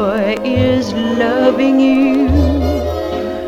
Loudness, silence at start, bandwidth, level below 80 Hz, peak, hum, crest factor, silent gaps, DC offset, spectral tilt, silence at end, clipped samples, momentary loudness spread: -14 LUFS; 0 s; 13 kHz; -26 dBFS; 0 dBFS; none; 14 dB; none; under 0.1%; -7 dB/octave; 0 s; under 0.1%; 7 LU